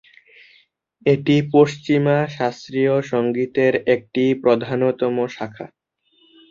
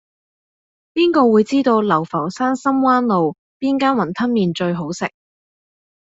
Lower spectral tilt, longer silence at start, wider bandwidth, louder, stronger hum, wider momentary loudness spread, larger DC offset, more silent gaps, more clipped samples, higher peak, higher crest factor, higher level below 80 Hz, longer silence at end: about the same, -7.5 dB/octave vs -6.5 dB/octave; about the same, 1.05 s vs 0.95 s; about the same, 7.4 kHz vs 7.8 kHz; about the same, -19 LUFS vs -17 LUFS; neither; about the same, 9 LU vs 10 LU; neither; second, none vs 3.38-3.60 s; neither; about the same, -2 dBFS vs -2 dBFS; about the same, 18 dB vs 16 dB; about the same, -62 dBFS vs -60 dBFS; about the same, 0.85 s vs 0.95 s